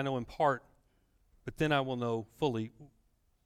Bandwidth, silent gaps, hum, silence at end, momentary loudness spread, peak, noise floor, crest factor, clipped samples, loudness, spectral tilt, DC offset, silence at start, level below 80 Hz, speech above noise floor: 15.5 kHz; none; none; 0.6 s; 13 LU; -16 dBFS; -72 dBFS; 20 dB; under 0.1%; -33 LUFS; -6.5 dB/octave; under 0.1%; 0 s; -60 dBFS; 38 dB